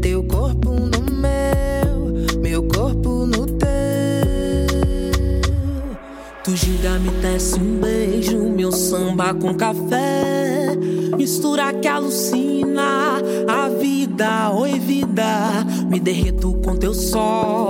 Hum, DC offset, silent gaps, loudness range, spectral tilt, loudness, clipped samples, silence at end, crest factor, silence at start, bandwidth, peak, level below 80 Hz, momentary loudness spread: none; under 0.1%; none; 2 LU; -5.5 dB/octave; -19 LUFS; under 0.1%; 0 s; 14 dB; 0 s; 17 kHz; -4 dBFS; -24 dBFS; 2 LU